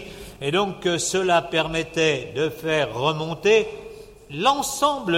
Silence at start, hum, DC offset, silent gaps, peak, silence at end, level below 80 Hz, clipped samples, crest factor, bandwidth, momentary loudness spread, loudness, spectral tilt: 0 s; none; under 0.1%; none; -6 dBFS; 0 s; -50 dBFS; under 0.1%; 16 dB; 16.5 kHz; 12 LU; -22 LUFS; -3.5 dB/octave